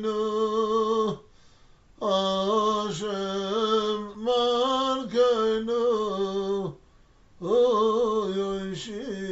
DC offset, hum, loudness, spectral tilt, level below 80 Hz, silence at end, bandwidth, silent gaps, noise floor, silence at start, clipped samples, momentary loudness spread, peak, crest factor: under 0.1%; none; -26 LUFS; -5 dB/octave; -58 dBFS; 0 s; 8 kHz; none; -56 dBFS; 0 s; under 0.1%; 10 LU; -12 dBFS; 14 dB